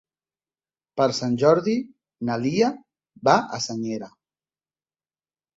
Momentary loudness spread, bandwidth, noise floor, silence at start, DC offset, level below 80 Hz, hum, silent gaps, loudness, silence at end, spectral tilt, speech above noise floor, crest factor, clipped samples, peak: 16 LU; 8 kHz; under -90 dBFS; 0.95 s; under 0.1%; -66 dBFS; none; none; -23 LUFS; 1.5 s; -5.5 dB/octave; over 68 dB; 22 dB; under 0.1%; -2 dBFS